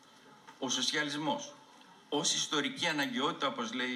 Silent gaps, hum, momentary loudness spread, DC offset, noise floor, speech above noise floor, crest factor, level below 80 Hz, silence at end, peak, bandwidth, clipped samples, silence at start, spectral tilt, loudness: none; none; 8 LU; under 0.1%; -58 dBFS; 24 dB; 18 dB; -88 dBFS; 0 s; -16 dBFS; 15.5 kHz; under 0.1%; 0.25 s; -2 dB/octave; -33 LUFS